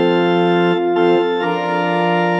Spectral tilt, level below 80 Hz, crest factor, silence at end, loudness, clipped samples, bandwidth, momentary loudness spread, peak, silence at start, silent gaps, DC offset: -7.5 dB/octave; -82 dBFS; 12 dB; 0 s; -16 LUFS; under 0.1%; 7.4 kHz; 4 LU; -4 dBFS; 0 s; none; under 0.1%